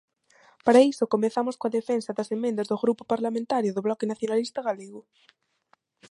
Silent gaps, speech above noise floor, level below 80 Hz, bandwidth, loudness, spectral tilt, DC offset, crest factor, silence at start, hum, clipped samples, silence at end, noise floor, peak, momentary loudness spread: none; 42 dB; -74 dBFS; 11.5 kHz; -26 LUFS; -5.5 dB/octave; under 0.1%; 20 dB; 0.65 s; none; under 0.1%; 1.1 s; -67 dBFS; -6 dBFS; 11 LU